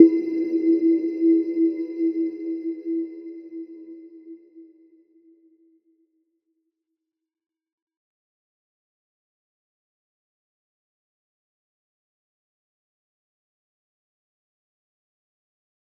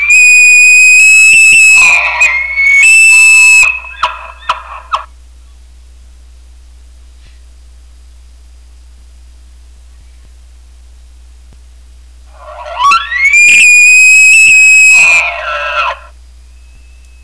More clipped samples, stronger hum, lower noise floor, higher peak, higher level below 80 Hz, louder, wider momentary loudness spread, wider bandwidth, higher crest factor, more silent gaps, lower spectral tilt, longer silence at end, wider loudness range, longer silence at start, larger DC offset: neither; neither; first, -86 dBFS vs -35 dBFS; about the same, -2 dBFS vs -2 dBFS; second, -88 dBFS vs -36 dBFS; second, -23 LUFS vs -2 LUFS; first, 23 LU vs 18 LU; second, 5.2 kHz vs 11 kHz; first, 26 dB vs 6 dB; neither; first, -8.5 dB/octave vs 2 dB/octave; first, 11.35 s vs 1.25 s; first, 22 LU vs 19 LU; about the same, 0 s vs 0 s; neither